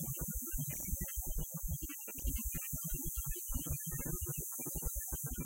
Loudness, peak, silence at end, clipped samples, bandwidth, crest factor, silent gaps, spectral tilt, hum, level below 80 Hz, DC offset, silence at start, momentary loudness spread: -39 LUFS; -24 dBFS; 0 s; under 0.1%; 16 kHz; 16 dB; none; -4 dB/octave; none; -44 dBFS; under 0.1%; 0 s; 2 LU